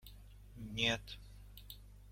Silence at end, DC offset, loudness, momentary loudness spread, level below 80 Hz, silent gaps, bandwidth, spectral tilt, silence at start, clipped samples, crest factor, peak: 0 s; under 0.1%; -37 LUFS; 23 LU; -56 dBFS; none; 16.5 kHz; -3.5 dB/octave; 0 s; under 0.1%; 24 dB; -20 dBFS